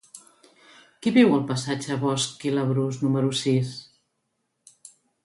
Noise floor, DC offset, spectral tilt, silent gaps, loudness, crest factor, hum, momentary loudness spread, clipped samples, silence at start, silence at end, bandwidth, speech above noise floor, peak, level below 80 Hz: -76 dBFS; under 0.1%; -5.5 dB/octave; none; -24 LUFS; 20 dB; none; 9 LU; under 0.1%; 0.15 s; 1.4 s; 11.5 kHz; 53 dB; -6 dBFS; -66 dBFS